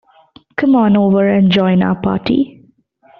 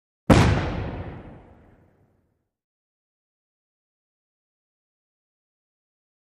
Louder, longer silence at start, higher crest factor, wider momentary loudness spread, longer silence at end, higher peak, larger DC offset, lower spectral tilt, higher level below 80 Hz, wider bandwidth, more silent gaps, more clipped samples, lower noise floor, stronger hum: first, -13 LUFS vs -21 LUFS; first, 0.6 s vs 0.3 s; second, 12 dB vs 28 dB; second, 7 LU vs 21 LU; second, 0.7 s vs 4.9 s; about the same, -2 dBFS vs 0 dBFS; neither; about the same, -6 dB/octave vs -6.5 dB/octave; second, -48 dBFS vs -38 dBFS; second, 5.4 kHz vs 15 kHz; neither; neither; second, -50 dBFS vs -71 dBFS; neither